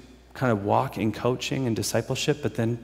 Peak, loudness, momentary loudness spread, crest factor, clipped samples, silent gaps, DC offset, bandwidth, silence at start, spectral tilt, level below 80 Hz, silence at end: -8 dBFS; -26 LUFS; 4 LU; 18 dB; under 0.1%; none; under 0.1%; 16 kHz; 0.05 s; -5.5 dB/octave; -54 dBFS; 0 s